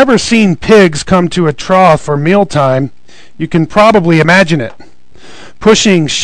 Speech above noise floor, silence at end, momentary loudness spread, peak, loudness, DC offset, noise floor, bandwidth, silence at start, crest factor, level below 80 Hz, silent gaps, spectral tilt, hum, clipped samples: 29 dB; 0 s; 8 LU; 0 dBFS; -8 LUFS; 4%; -37 dBFS; 12 kHz; 0 s; 10 dB; -36 dBFS; none; -5 dB/octave; none; 5%